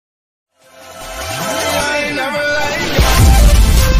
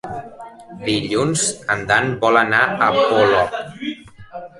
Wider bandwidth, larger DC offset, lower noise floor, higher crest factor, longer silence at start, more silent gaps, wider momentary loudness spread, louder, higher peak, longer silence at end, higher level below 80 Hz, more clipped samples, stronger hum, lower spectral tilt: first, 15.5 kHz vs 11.5 kHz; neither; about the same, -38 dBFS vs -37 dBFS; second, 12 dB vs 18 dB; first, 0.65 s vs 0.05 s; neither; second, 13 LU vs 21 LU; first, -13 LUFS vs -17 LUFS; about the same, 0 dBFS vs -2 dBFS; about the same, 0 s vs 0.1 s; first, -14 dBFS vs -50 dBFS; neither; neither; about the same, -4 dB/octave vs -3.5 dB/octave